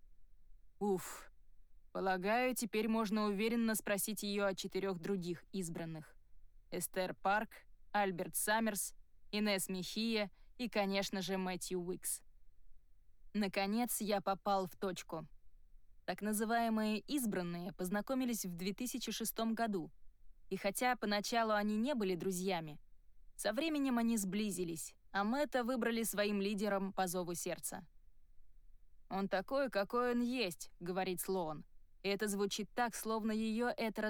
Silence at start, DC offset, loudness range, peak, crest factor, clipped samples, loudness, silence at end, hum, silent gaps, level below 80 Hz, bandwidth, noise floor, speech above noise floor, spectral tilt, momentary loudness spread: 0 s; under 0.1%; 3 LU; -26 dBFS; 14 dB; under 0.1%; -38 LUFS; 0 s; none; none; -62 dBFS; over 20 kHz; -59 dBFS; 21 dB; -4 dB/octave; 9 LU